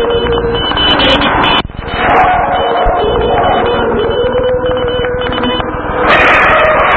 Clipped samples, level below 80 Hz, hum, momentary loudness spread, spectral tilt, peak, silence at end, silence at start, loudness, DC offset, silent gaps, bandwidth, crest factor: 0.2%; -24 dBFS; none; 8 LU; -6 dB/octave; 0 dBFS; 0 s; 0 s; -10 LUFS; 0.2%; none; 8 kHz; 10 dB